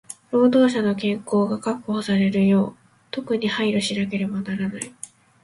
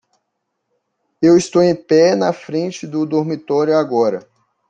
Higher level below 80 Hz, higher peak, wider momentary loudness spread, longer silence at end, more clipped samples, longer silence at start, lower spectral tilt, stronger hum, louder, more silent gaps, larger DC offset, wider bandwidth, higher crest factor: about the same, -60 dBFS vs -60 dBFS; second, -6 dBFS vs -2 dBFS; first, 15 LU vs 10 LU; second, 0.35 s vs 0.5 s; neither; second, 0.1 s vs 1.2 s; about the same, -6 dB/octave vs -6 dB/octave; neither; second, -22 LUFS vs -16 LUFS; neither; neither; first, 11.5 kHz vs 9.2 kHz; about the same, 16 dB vs 14 dB